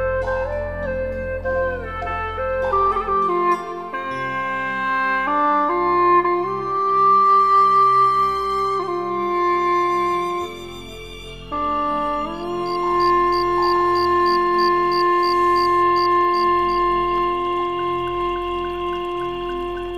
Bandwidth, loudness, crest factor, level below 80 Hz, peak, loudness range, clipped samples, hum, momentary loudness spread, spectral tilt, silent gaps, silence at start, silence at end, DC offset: 14.5 kHz; -19 LUFS; 12 dB; -42 dBFS; -6 dBFS; 6 LU; under 0.1%; none; 11 LU; -6 dB/octave; none; 0 s; 0 s; 0.4%